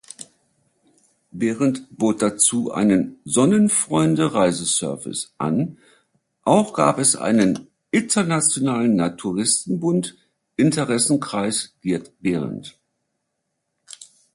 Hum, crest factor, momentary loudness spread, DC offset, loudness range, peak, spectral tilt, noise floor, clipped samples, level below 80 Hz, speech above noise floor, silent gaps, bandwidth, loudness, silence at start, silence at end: none; 20 dB; 11 LU; under 0.1%; 4 LU; -2 dBFS; -4.5 dB/octave; -76 dBFS; under 0.1%; -58 dBFS; 56 dB; none; 11.5 kHz; -20 LUFS; 0.2 s; 0.3 s